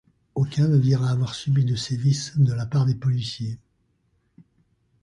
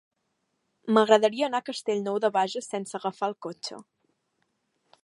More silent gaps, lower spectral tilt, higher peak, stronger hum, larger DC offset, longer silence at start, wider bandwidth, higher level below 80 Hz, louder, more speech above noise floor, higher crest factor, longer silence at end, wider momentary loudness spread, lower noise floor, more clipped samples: neither; first, -6.5 dB/octave vs -4.5 dB/octave; second, -10 dBFS vs -4 dBFS; neither; neither; second, 0.35 s vs 0.85 s; about the same, 10.5 kHz vs 11.5 kHz; first, -54 dBFS vs -84 dBFS; first, -23 LUFS vs -26 LUFS; second, 46 dB vs 51 dB; second, 14 dB vs 24 dB; first, 1.45 s vs 1.2 s; second, 12 LU vs 16 LU; second, -68 dBFS vs -77 dBFS; neither